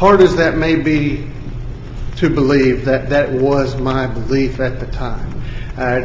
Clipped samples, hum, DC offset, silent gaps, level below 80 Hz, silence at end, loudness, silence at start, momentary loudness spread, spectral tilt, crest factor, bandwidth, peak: under 0.1%; none; under 0.1%; none; -28 dBFS; 0 s; -15 LUFS; 0 s; 16 LU; -7.5 dB/octave; 14 dB; 7.6 kHz; 0 dBFS